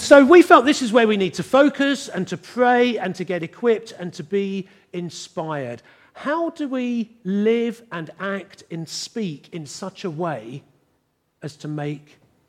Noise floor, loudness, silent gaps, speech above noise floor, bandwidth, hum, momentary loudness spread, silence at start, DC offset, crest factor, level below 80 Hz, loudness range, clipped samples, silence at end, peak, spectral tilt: -68 dBFS; -20 LUFS; none; 49 dB; 14.5 kHz; none; 18 LU; 0 s; under 0.1%; 20 dB; -66 dBFS; 13 LU; under 0.1%; 0.5 s; 0 dBFS; -5 dB/octave